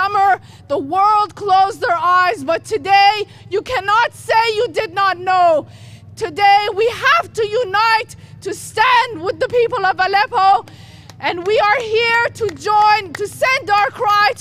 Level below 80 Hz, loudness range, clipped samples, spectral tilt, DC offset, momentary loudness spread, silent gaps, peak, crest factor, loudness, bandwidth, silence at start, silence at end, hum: -52 dBFS; 1 LU; under 0.1%; -3 dB/octave; under 0.1%; 10 LU; none; -2 dBFS; 14 dB; -15 LUFS; 15 kHz; 0 s; 0 s; none